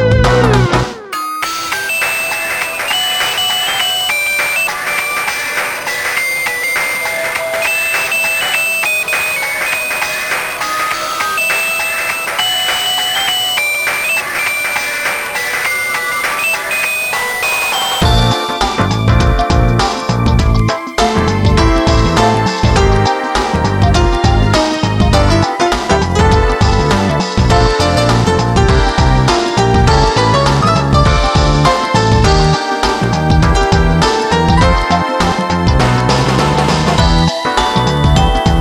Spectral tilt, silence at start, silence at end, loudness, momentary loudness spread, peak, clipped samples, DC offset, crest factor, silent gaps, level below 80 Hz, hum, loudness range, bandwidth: -4.5 dB/octave; 0 s; 0 s; -12 LUFS; 4 LU; 0 dBFS; under 0.1%; under 0.1%; 12 dB; none; -20 dBFS; none; 3 LU; 19.5 kHz